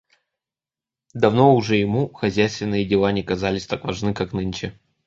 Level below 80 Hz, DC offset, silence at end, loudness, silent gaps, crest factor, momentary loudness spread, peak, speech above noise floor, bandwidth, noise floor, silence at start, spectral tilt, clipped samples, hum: -48 dBFS; under 0.1%; 0.35 s; -21 LUFS; none; 20 dB; 11 LU; -2 dBFS; over 70 dB; 7.8 kHz; under -90 dBFS; 1.15 s; -6.5 dB/octave; under 0.1%; none